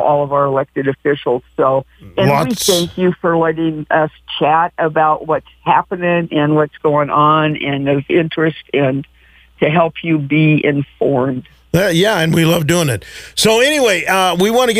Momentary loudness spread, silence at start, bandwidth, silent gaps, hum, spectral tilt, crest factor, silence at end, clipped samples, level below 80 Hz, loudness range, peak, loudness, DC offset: 7 LU; 0 s; 16 kHz; none; none; -5 dB/octave; 14 dB; 0 s; under 0.1%; -46 dBFS; 2 LU; 0 dBFS; -14 LUFS; under 0.1%